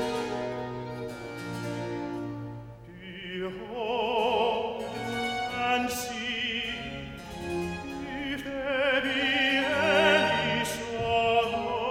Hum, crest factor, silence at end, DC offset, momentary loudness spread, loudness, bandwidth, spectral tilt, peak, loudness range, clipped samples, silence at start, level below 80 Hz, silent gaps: none; 20 dB; 0 s; under 0.1%; 14 LU; -28 LUFS; 17 kHz; -4 dB/octave; -8 dBFS; 11 LU; under 0.1%; 0 s; -54 dBFS; none